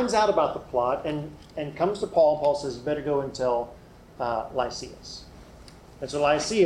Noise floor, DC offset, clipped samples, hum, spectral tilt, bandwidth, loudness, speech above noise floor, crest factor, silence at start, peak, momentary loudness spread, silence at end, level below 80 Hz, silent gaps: -48 dBFS; under 0.1%; under 0.1%; none; -4.5 dB/octave; 11.5 kHz; -26 LUFS; 22 dB; 16 dB; 0 s; -10 dBFS; 17 LU; 0 s; -52 dBFS; none